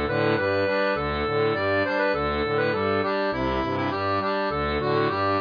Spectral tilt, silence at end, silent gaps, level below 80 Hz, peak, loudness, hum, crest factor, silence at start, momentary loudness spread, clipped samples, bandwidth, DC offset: -7.5 dB/octave; 0 s; none; -42 dBFS; -12 dBFS; -24 LUFS; none; 12 dB; 0 s; 3 LU; under 0.1%; 5.2 kHz; under 0.1%